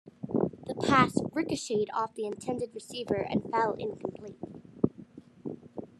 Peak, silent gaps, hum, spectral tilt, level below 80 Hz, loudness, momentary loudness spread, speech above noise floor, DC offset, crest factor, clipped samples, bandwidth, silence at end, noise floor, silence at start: -8 dBFS; none; none; -5.5 dB/octave; -64 dBFS; -31 LUFS; 19 LU; 21 dB; under 0.1%; 24 dB; under 0.1%; 13 kHz; 0.15 s; -51 dBFS; 0.05 s